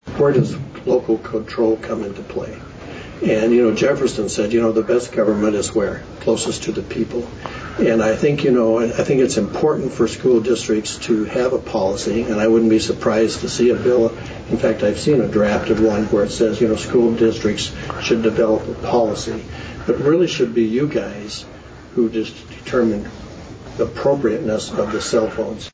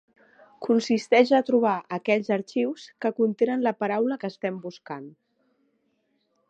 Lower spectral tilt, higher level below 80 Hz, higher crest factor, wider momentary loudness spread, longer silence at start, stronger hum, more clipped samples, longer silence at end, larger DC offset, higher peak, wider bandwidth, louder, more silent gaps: about the same, -5.5 dB/octave vs -6 dB/octave; first, -42 dBFS vs -78 dBFS; second, 12 dB vs 20 dB; second, 12 LU vs 16 LU; second, 0.05 s vs 0.6 s; neither; neither; second, 0.05 s vs 1.4 s; neither; about the same, -6 dBFS vs -6 dBFS; about the same, 8 kHz vs 8.8 kHz; first, -18 LUFS vs -24 LUFS; neither